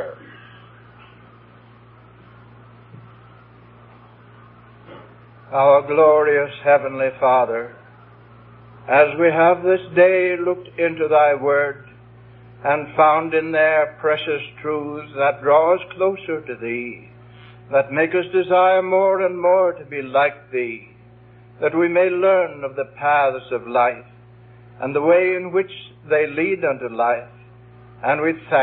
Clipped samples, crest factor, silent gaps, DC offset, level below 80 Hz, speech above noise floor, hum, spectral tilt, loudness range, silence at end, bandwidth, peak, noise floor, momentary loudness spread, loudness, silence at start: under 0.1%; 20 dB; none; under 0.1%; -62 dBFS; 29 dB; none; -10.5 dB/octave; 3 LU; 0 s; 4.1 kHz; 0 dBFS; -47 dBFS; 12 LU; -18 LUFS; 0 s